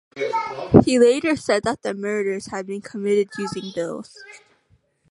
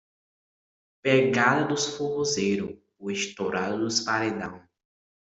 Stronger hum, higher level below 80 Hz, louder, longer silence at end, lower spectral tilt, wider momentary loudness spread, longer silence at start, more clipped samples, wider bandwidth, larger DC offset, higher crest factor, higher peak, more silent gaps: neither; first, -48 dBFS vs -66 dBFS; first, -21 LUFS vs -26 LUFS; about the same, 0.75 s vs 0.7 s; first, -6 dB/octave vs -4 dB/octave; about the same, 14 LU vs 12 LU; second, 0.15 s vs 1.05 s; neither; first, 11.5 kHz vs 8.2 kHz; neither; about the same, 22 dB vs 22 dB; first, 0 dBFS vs -6 dBFS; neither